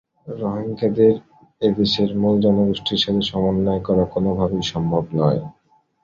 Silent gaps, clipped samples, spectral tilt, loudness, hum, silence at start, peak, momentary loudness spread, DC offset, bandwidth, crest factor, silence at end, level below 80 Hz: none; under 0.1%; -7 dB/octave; -20 LUFS; none; 0.25 s; -4 dBFS; 9 LU; under 0.1%; 7.4 kHz; 16 dB; 0.5 s; -44 dBFS